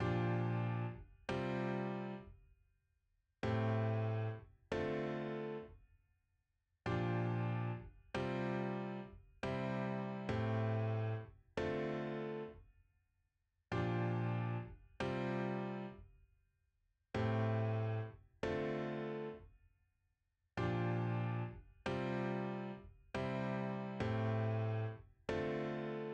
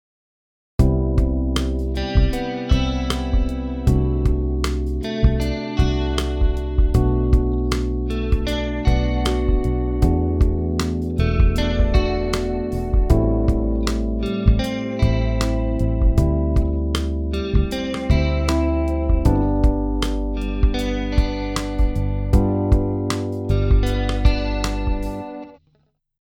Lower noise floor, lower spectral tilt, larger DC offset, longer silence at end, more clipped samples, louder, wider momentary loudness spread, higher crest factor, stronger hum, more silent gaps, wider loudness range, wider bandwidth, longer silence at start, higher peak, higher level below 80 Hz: first, -84 dBFS vs -63 dBFS; about the same, -8 dB/octave vs -7 dB/octave; neither; second, 0 s vs 0.65 s; neither; second, -41 LUFS vs -21 LUFS; first, 10 LU vs 5 LU; about the same, 16 dB vs 18 dB; neither; neither; about the same, 2 LU vs 1 LU; second, 8.2 kHz vs 13 kHz; second, 0 s vs 0.8 s; second, -26 dBFS vs -2 dBFS; second, -64 dBFS vs -22 dBFS